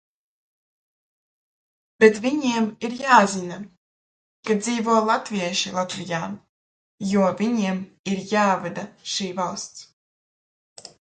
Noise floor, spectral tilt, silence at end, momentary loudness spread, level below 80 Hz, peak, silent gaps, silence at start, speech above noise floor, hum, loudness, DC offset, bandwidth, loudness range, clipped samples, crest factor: under -90 dBFS; -4.5 dB/octave; 0.3 s; 16 LU; -68 dBFS; 0 dBFS; 3.77-4.43 s, 6.49-6.98 s, 7.99-8.04 s, 9.93-10.76 s; 2 s; over 68 dB; none; -22 LUFS; under 0.1%; 9.4 kHz; 4 LU; under 0.1%; 24 dB